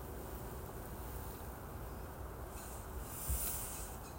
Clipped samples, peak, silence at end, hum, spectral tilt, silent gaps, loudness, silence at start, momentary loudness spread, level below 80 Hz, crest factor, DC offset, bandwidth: under 0.1%; -26 dBFS; 0 s; none; -4 dB/octave; none; -44 LUFS; 0 s; 10 LU; -50 dBFS; 18 dB; under 0.1%; 16.5 kHz